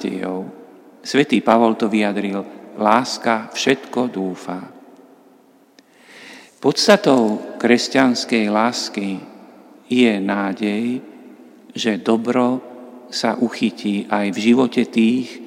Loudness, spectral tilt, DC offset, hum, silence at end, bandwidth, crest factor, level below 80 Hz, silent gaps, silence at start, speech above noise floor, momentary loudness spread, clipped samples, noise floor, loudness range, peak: -18 LUFS; -4.5 dB/octave; under 0.1%; none; 0 s; 14.5 kHz; 20 dB; -70 dBFS; none; 0 s; 34 dB; 14 LU; under 0.1%; -52 dBFS; 5 LU; 0 dBFS